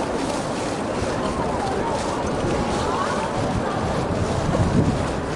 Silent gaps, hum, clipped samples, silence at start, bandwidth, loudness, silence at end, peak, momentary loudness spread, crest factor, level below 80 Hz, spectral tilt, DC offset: none; none; under 0.1%; 0 s; 11.5 kHz; -23 LUFS; 0 s; -8 dBFS; 4 LU; 16 dB; -36 dBFS; -6 dB/octave; under 0.1%